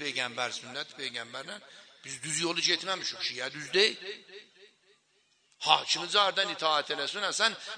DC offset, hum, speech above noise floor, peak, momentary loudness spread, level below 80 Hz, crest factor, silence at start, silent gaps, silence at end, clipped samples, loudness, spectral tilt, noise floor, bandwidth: under 0.1%; none; 39 dB; -6 dBFS; 16 LU; -84 dBFS; 26 dB; 0 s; none; 0 s; under 0.1%; -29 LUFS; -1 dB/octave; -70 dBFS; 10.5 kHz